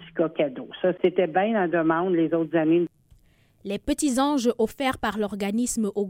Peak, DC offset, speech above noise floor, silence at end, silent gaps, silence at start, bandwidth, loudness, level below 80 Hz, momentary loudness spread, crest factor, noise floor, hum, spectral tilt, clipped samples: -8 dBFS; under 0.1%; 36 dB; 0 s; none; 0 s; 16.5 kHz; -24 LUFS; -52 dBFS; 6 LU; 16 dB; -59 dBFS; none; -5 dB/octave; under 0.1%